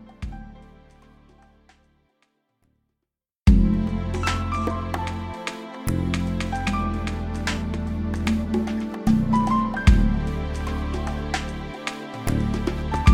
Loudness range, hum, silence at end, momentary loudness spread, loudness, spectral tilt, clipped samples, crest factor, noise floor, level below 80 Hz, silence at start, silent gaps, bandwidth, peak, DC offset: 4 LU; none; 0 s; 12 LU; -25 LUFS; -6.5 dB/octave; under 0.1%; 20 dB; -84 dBFS; -28 dBFS; 0 s; none; 15.5 kHz; -2 dBFS; under 0.1%